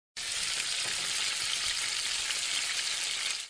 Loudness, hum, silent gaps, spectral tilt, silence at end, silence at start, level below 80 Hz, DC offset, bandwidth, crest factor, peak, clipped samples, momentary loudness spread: -29 LUFS; none; none; 2.5 dB/octave; 0 s; 0.15 s; -66 dBFS; under 0.1%; 10.5 kHz; 20 dB; -14 dBFS; under 0.1%; 1 LU